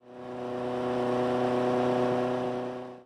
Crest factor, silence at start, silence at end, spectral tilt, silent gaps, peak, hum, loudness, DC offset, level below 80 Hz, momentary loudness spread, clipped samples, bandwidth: 12 dB; 0.05 s; 0 s; -7 dB/octave; none; -18 dBFS; none; -29 LUFS; under 0.1%; -64 dBFS; 10 LU; under 0.1%; 11.5 kHz